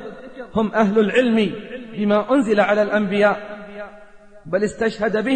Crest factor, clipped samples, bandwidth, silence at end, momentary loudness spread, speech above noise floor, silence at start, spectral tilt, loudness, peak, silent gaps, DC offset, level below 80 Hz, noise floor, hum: 14 dB; under 0.1%; 9 kHz; 0 s; 18 LU; 25 dB; 0 s; -6.5 dB/octave; -19 LUFS; -4 dBFS; none; 0.3%; -52 dBFS; -44 dBFS; none